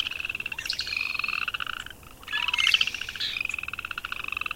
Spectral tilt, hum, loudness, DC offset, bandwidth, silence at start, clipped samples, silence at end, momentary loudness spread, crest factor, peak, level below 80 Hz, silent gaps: 0 dB/octave; none; -27 LUFS; under 0.1%; 17 kHz; 0 s; under 0.1%; 0 s; 12 LU; 24 dB; -6 dBFS; -54 dBFS; none